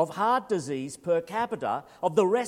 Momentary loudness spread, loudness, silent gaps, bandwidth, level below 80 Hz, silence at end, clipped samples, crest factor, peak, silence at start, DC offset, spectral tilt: 7 LU; -28 LUFS; none; 15.5 kHz; -72 dBFS; 0 s; under 0.1%; 18 dB; -8 dBFS; 0 s; under 0.1%; -5.5 dB/octave